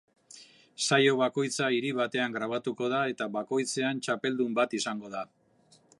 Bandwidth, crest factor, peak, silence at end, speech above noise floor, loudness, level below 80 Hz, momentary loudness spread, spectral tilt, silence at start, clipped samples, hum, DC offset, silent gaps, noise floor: 11.5 kHz; 20 dB; -10 dBFS; 0.75 s; 34 dB; -29 LUFS; -82 dBFS; 10 LU; -3.5 dB/octave; 0.3 s; under 0.1%; none; under 0.1%; none; -63 dBFS